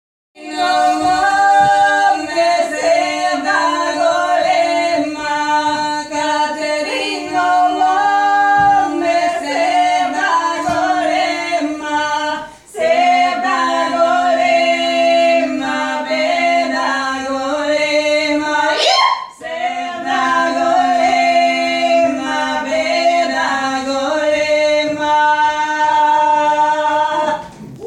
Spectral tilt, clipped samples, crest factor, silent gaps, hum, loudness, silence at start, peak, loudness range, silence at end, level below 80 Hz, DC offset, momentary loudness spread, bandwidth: -2.5 dB/octave; under 0.1%; 14 dB; none; none; -14 LUFS; 0.35 s; 0 dBFS; 2 LU; 0 s; -54 dBFS; under 0.1%; 7 LU; 12 kHz